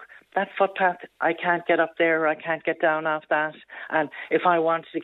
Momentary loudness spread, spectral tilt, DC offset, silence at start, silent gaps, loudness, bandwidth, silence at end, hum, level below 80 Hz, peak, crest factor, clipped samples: 7 LU; -8 dB/octave; under 0.1%; 0 s; none; -24 LUFS; 4.1 kHz; 0 s; none; -78 dBFS; -6 dBFS; 18 dB; under 0.1%